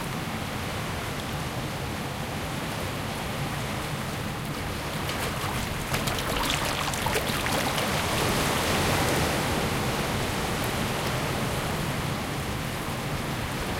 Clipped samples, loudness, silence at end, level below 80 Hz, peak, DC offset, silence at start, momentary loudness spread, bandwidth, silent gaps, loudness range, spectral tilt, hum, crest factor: under 0.1%; -28 LUFS; 0 s; -42 dBFS; -10 dBFS; under 0.1%; 0 s; 7 LU; 17 kHz; none; 6 LU; -4 dB/octave; none; 18 dB